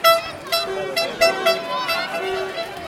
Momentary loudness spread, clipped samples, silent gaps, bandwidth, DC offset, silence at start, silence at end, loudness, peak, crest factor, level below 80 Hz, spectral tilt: 8 LU; under 0.1%; none; 17 kHz; under 0.1%; 0 s; 0 s; -21 LUFS; -2 dBFS; 18 dB; -56 dBFS; -2 dB/octave